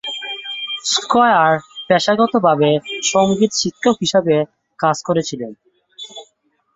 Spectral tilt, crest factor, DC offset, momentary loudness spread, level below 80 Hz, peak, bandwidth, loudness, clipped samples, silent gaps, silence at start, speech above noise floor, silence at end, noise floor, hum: -4 dB/octave; 16 dB; under 0.1%; 16 LU; -58 dBFS; 0 dBFS; 8 kHz; -16 LUFS; under 0.1%; none; 0.05 s; 47 dB; 0.55 s; -62 dBFS; none